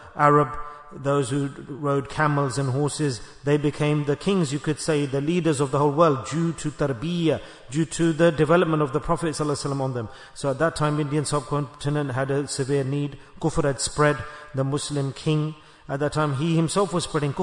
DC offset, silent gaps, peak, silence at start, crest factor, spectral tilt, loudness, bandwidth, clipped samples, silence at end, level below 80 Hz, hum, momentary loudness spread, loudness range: under 0.1%; none; -4 dBFS; 0 s; 20 dB; -6 dB/octave; -24 LUFS; 11 kHz; under 0.1%; 0 s; -48 dBFS; none; 9 LU; 3 LU